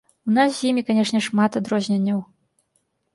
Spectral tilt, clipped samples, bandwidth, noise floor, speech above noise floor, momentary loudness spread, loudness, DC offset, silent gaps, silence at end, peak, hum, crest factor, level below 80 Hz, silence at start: -5.5 dB/octave; under 0.1%; 11.5 kHz; -70 dBFS; 50 dB; 4 LU; -21 LUFS; under 0.1%; none; 0.9 s; -6 dBFS; none; 16 dB; -68 dBFS; 0.25 s